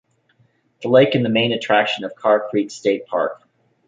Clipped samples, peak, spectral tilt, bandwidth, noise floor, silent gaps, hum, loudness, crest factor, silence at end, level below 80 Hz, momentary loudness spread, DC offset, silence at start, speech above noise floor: under 0.1%; -2 dBFS; -5.5 dB/octave; 7.8 kHz; -60 dBFS; none; none; -18 LUFS; 18 dB; 0.55 s; -64 dBFS; 8 LU; under 0.1%; 0.8 s; 43 dB